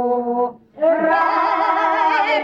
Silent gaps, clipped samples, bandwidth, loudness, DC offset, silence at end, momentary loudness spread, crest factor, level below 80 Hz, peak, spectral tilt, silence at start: none; under 0.1%; 7.6 kHz; -18 LUFS; under 0.1%; 0 s; 5 LU; 12 dB; -66 dBFS; -6 dBFS; -5 dB/octave; 0 s